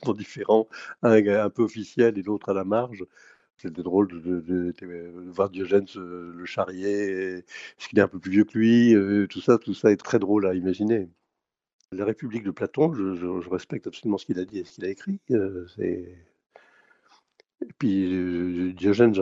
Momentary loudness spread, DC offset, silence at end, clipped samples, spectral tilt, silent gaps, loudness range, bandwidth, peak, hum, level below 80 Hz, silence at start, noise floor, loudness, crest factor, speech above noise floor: 18 LU; under 0.1%; 0 s; under 0.1%; -7.5 dB/octave; 11.73-11.79 s; 9 LU; 7.8 kHz; -4 dBFS; none; -70 dBFS; 0 s; -83 dBFS; -25 LUFS; 22 dB; 59 dB